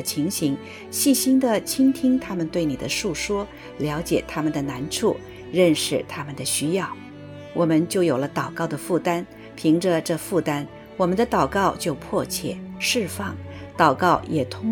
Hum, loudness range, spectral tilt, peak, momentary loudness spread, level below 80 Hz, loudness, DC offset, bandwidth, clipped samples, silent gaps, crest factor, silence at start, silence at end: none; 2 LU; -4.5 dB/octave; -2 dBFS; 12 LU; -50 dBFS; -23 LUFS; under 0.1%; 19 kHz; under 0.1%; none; 20 dB; 0 s; 0 s